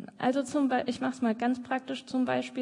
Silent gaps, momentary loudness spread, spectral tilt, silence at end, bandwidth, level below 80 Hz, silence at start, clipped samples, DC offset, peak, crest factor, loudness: none; 5 LU; -5 dB/octave; 0 s; 11 kHz; -74 dBFS; 0 s; under 0.1%; under 0.1%; -16 dBFS; 14 dB; -30 LUFS